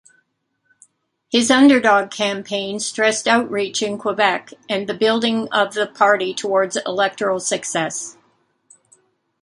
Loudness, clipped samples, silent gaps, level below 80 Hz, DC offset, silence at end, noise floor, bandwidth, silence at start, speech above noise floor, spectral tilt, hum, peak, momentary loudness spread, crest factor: -18 LUFS; under 0.1%; none; -68 dBFS; under 0.1%; 1.3 s; -70 dBFS; 11.5 kHz; 1.3 s; 52 dB; -3 dB/octave; none; 0 dBFS; 11 LU; 18 dB